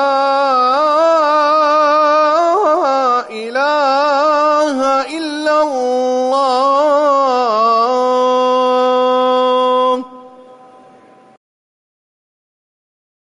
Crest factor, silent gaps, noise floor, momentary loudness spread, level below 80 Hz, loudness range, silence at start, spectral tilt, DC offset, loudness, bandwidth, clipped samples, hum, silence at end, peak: 10 dB; none; -44 dBFS; 4 LU; -64 dBFS; 5 LU; 0 s; -2.5 dB/octave; under 0.1%; -13 LUFS; 11 kHz; under 0.1%; none; 2.95 s; -4 dBFS